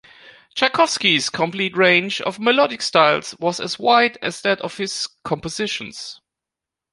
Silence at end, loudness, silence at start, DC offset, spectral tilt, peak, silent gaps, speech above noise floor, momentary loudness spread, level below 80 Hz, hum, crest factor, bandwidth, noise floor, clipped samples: 0.8 s; -18 LUFS; 0.25 s; under 0.1%; -3 dB/octave; -2 dBFS; none; 67 dB; 11 LU; -60 dBFS; none; 20 dB; 11.5 kHz; -86 dBFS; under 0.1%